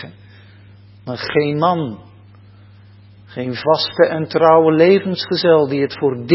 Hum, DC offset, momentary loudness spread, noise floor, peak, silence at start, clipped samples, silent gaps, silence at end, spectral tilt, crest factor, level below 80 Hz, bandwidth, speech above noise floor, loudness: 60 Hz at -50 dBFS; under 0.1%; 17 LU; -43 dBFS; 0 dBFS; 0 s; under 0.1%; none; 0 s; -9.5 dB/octave; 16 dB; -56 dBFS; 5.8 kHz; 29 dB; -15 LUFS